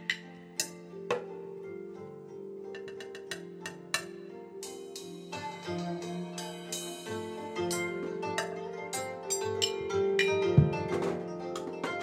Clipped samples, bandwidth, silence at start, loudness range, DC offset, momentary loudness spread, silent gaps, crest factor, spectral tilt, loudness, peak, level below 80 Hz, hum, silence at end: under 0.1%; 16.5 kHz; 0 s; 10 LU; under 0.1%; 16 LU; none; 24 dB; -4.5 dB/octave; -34 LUFS; -10 dBFS; -60 dBFS; none; 0 s